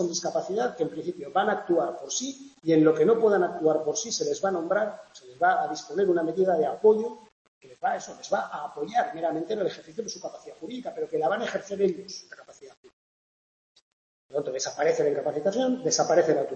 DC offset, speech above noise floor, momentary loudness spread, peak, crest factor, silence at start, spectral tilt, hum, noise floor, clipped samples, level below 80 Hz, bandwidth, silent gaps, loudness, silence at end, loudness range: under 0.1%; over 64 dB; 14 LU; -8 dBFS; 20 dB; 0 s; -4 dB/octave; none; under -90 dBFS; under 0.1%; -74 dBFS; 8.4 kHz; 7.32-7.61 s, 12.77-12.83 s, 12.93-13.75 s, 13.82-14.29 s; -26 LUFS; 0 s; 7 LU